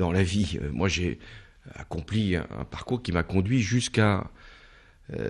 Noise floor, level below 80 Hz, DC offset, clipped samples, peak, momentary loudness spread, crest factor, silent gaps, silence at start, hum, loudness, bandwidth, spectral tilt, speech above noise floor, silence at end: -54 dBFS; -46 dBFS; under 0.1%; under 0.1%; -8 dBFS; 18 LU; 20 dB; none; 0 s; none; -27 LUFS; 11 kHz; -5.5 dB/octave; 27 dB; 0 s